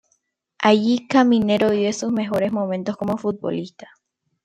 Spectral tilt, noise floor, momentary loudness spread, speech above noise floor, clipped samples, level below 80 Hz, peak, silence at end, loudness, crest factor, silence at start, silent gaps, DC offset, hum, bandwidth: -5.5 dB/octave; -69 dBFS; 10 LU; 49 dB; under 0.1%; -62 dBFS; -2 dBFS; 0.75 s; -20 LUFS; 18 dB; 0.6 s; none; under 0.1%; none; 9.2 kHz